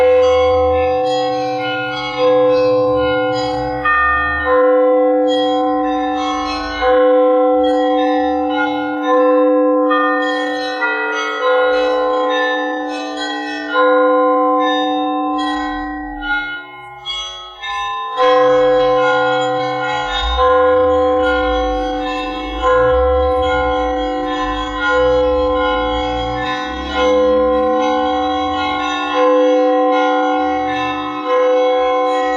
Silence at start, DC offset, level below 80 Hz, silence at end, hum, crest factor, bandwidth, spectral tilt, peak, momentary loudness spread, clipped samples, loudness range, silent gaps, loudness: 0 s; under 0.1%; -34 dBFS; 0 s; none; 12 dB; 7.4 kHz; -5 dB/octave; -2 dBFS; 8 LU; under 0.1%; 3 LU; none; -15 LUFS